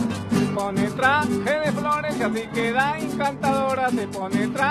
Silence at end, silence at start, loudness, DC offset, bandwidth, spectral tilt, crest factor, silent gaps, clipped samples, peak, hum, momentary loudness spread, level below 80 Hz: 0 s; 0 s; -23 LUFS; under 0.1%; 14 kHz; -5.5 dB/octave; 16 dB; none; under 0.1%; -6 dBFS; none; 5 LU; -54 dBFS